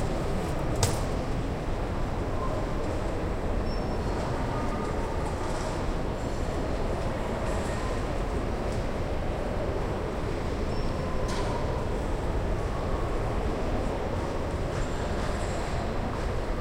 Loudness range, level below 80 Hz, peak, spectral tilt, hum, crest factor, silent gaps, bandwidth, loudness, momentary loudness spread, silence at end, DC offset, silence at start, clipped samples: 1 LU; -32 dBFS; -8 dBFS; -6 dB/octave; none; 20 dB; none; 16.5 kHz; -31 LUFS; 1 LU; 0 s; under 0.1%; 0 s; under 0.1%